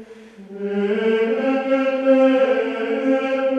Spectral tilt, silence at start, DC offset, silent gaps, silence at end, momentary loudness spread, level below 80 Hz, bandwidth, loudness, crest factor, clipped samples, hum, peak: -6.5 dB/octave; 0 s; under 0.1%; none; 0 s; 8 LU; -70 dBFS; 7.8 kHz; -19 LUFS; 14 dB; under 0.1%; none; -6 dBFS